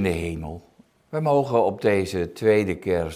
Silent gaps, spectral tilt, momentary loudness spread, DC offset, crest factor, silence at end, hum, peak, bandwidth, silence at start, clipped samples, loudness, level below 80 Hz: none; -7 dB/octave; 13 LU; under 0.1%; 16 dB; 0 s; none; -6 dBFS; 15.5 kHz; 0 s; under 0.1%; -23 LUFS; -46 dBFS